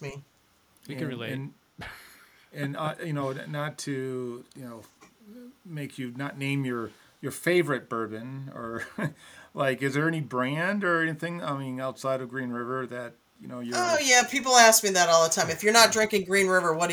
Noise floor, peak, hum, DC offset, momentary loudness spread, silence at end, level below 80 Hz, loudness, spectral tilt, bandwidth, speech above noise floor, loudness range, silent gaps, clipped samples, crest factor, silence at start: -64 dBFS; -4 dBFS; none; under 0.1%; 21 LU; 0 s; -68 dBFS; -25 LUFS; -3 dB/octave; over 20 kHz; 37 dB; 15 LU; none; under 0.1%; 24 dB; 0 s